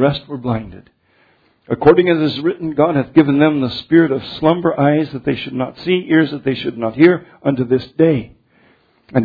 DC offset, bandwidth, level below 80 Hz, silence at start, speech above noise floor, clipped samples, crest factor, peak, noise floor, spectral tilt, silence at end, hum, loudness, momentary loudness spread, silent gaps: under 0.1%; 5 kHz; -48 dBFS; 0 s; 41 dB; under 0.1%; 16 dB; 0 dBFS; -56 dBFS; -9.5 dB/octave; 0 s; none; -16 LUFS; 10 LU; none